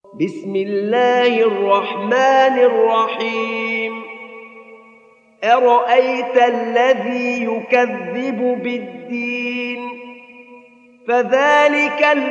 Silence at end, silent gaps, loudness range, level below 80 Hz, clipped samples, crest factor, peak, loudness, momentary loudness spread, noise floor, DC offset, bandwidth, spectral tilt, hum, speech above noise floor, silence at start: 0 s; none; 6 LU; -80 dBFS; under 0.1%; 16 dB; 0 dBFS; -16 LUFS; 14 LU; -49 dBFS; under 0.1%; 7.4 kHz; -4.5 dB/octave; none; 33 dB; 0.15 s